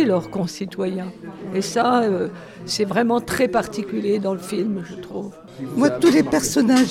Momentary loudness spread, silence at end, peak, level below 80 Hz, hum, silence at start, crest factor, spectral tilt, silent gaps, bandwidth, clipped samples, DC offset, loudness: 16 LU; 0 s; -4 dBFS; -54 dBFS; none; 0 s; 18 dB; -5 dB/octave; none; 16.5 kHz; under 0.1%; under 0.1%; -21 LUFS